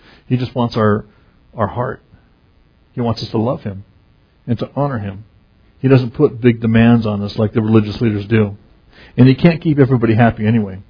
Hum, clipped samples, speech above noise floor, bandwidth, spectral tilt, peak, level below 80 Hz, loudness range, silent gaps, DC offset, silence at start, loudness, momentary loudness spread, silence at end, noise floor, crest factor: none; under 0.1%; 38 dB; 5.4 kHz; -9.5 dB/octave; 0 dBFS; -42 dBFS; 9 LU; none; under 0.1%; 0.3 s; -15 LUFS; 14 LU; 0.05 s; -52 dBFS; 16 dB